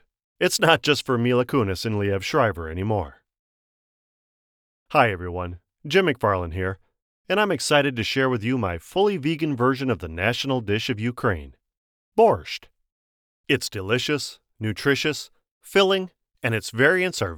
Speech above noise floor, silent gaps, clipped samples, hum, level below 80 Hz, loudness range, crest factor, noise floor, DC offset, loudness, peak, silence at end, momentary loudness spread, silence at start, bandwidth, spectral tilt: over 68 dB; 3.39-4.86 s, 7.02-7.25 s, 11.77-12.12 s, 12.92-13.44 s, 15.51-15.61 s; under 0.1%; none; -50 dBFS; 4 LU; 22 dB; under -90 dBFS; under 0.1%; -23 LUFS; -2 dBFS; 0 s; 11 LU; 0.4 s; 19.5 kHz; -4.5 dB/octave